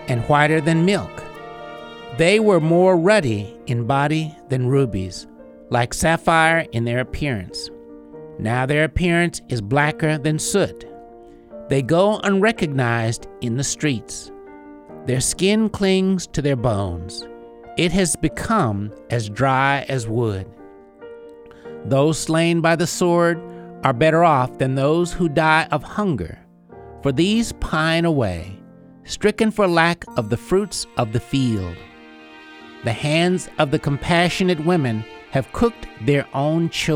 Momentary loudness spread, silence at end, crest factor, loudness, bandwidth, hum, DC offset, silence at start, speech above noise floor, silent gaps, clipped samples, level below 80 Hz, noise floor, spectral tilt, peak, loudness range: 17 LU; 0 s; 18 dB; -19 LUFS; 16 kHz; none; under 0.1%; 0 s; 25 dB; none; under 0.1%; -42 dBFS; -44 dBFS; -5.5 dB/octave; 0 dBFS; 4 LU